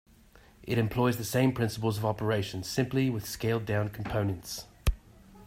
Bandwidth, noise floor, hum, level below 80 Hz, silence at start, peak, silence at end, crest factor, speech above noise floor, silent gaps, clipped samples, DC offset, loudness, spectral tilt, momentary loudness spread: 16 kHz; -57 dBFS; none; -44 dBFS; 0.6 s; -12 dBFS; 0 s; 18 dB; 28 dB; none; under 0.1%; under 0.1%; -30 LUFS; -6 dB/octave; 7 LU